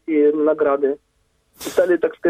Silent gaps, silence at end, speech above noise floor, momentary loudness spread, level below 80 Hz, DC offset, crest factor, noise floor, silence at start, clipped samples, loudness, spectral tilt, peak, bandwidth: none; 0 s; 45 dB; 11 LU; -62 dBFS; under 0.1%; 16 dB; -63 dBFS; 0.1 s; under 0.1%; -18 LUFS; -5 dB/octave; -4 dBFS; 16 kHz